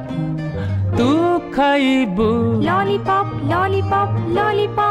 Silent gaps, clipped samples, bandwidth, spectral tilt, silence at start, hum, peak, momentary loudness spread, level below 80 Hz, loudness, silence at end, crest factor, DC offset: none; under 0.1%; 12 kHz; -7.5 dB/octave; 0 s; none; -6 dBFS; 7 LU; -42 dBFS; -18 LUFS; 0 s; 12 dB; under 0.1%